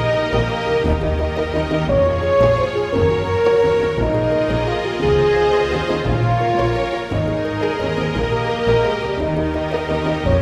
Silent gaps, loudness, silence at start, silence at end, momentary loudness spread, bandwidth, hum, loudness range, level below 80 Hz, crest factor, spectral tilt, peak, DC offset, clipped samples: none; -18 LUFS; 0 s; 0 s; 6 LU; 11 kHz; none; 3 LU; -30 dBFS; 14 dB; -7 dB/octave; -2 dBFS; under 0.1%; under 0.1%